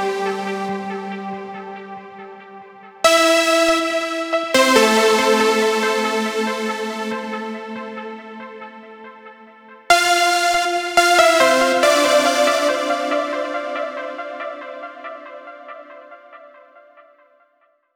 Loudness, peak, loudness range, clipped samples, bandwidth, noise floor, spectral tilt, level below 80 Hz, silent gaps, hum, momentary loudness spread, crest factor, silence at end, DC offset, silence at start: -17 LUFS; -2 dBFS; 15 LU; under 0.1%; over 20 kHz; -61 dBFS; -2 dB/octave; -60 dBFS; none; none; 22 LU; 18 dB; 1.5 s; under 0.1%; 0 s